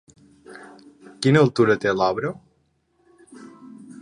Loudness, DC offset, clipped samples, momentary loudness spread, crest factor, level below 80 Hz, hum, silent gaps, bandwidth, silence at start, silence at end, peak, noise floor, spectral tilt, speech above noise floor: -20 LUFS; under 0.1%; under 0.1%; 26 LU; 22 dB; -62 dBFS; none; none; 11 kHz; 0.5 s; 0.05 s; -2 dBFS; -66 dBFS; -6.5 dB/octave; 48 dB